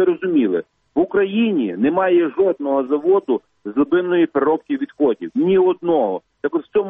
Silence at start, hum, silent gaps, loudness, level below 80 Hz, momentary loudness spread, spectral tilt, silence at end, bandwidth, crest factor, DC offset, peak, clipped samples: 0 s; none; none; -18 LUFS; -62 dBFS; 8 LU; -9.5 dB/octave; 0 s; 3.8 kHz; 12 dB; under 0.1%; -6 dBFS; under 0.1%